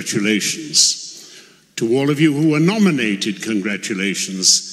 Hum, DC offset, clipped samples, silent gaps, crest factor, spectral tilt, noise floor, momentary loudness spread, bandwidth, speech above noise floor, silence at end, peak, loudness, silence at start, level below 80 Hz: none; under 0.1%; under 0.1%; none; 18 dB; -3 dB/octave; -44 dBFS; 11 LU; 15 kHz; 27 dB; 0 s; 0 dBFS; -16 LUFS; 0 s; -66 dBFS